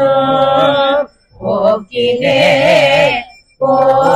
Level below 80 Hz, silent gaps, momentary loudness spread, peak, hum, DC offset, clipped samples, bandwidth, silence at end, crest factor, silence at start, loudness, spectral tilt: -46 dBFS; none; 10 LU; 0 dBFS; none; under 0.1%; under 0.1%; 12.5 kHz; 0 s; 12 dB; 0 s; -11 LUFS; -5 dB/octave